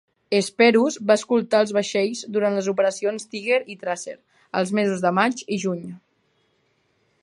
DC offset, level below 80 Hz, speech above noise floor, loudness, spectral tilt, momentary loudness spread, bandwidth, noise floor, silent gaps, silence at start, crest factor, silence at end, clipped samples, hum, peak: under 0.1%; -74 dBFS; 46 dB; -22 LUFS; -4.5 dB/octave; 12 LU; 11.5 kHz; -67 dBFS; none; 0.3 s; 20 dB; 1.25 s; under 0.1%; none; -2 dBFS